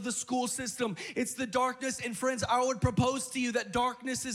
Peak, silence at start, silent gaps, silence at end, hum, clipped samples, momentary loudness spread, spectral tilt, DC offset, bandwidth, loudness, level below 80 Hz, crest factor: -14 dBFS; 0 s; none; 0 s; none; under 0.1%; 6 LU; -4 dB/octave; under 0.1%; 16.5 kHz; -31 LUFS; -56 dBFS; 18 dB